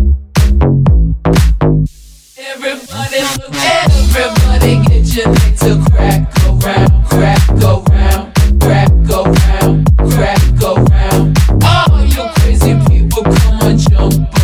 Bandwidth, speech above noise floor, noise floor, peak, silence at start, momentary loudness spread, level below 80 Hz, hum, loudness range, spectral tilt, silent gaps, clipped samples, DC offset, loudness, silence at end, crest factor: 16 kHz; 28 dB; -36 dBFS; 0 dBFS; 0 s; 5 LU; -12 dBFS; none; 3 LU; -6 dB/octave; none; under 0.1%; under 0.1%; -10 LUFS; 0 s; 8 dB